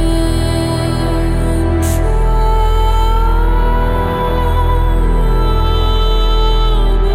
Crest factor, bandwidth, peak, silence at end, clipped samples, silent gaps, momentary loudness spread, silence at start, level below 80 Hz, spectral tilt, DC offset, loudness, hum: 10 dB; 14.5 kHz; -2 dBFS; 0 s; under 0.1%; none; 1 LU; 0 s; -12 dBFS; -6 dB/octave; under 0.1%; -15 LUFS; none